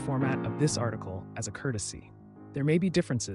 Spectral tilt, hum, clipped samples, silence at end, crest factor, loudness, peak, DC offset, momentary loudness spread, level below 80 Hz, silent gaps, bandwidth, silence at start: -5.5 dB/octave; none; under 0.1%; 0 s; 16 dB; -30 LUFS; -14 dBFS; under 0.1%; 13 LU; -58 dBFS; none; 11.5 kHz; 0 s